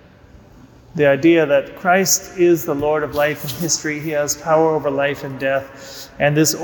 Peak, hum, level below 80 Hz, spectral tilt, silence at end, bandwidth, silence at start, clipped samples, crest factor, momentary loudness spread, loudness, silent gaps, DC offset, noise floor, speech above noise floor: -4 dBFS; none; -50 dBFS; -4 dB/octave; 0 s; 19.5 kHz; 0.95 s; under 0.1%; 14 dB; 9 LU; -17 LUFS; none; under 0.1%; -45 dBFS; 28 dB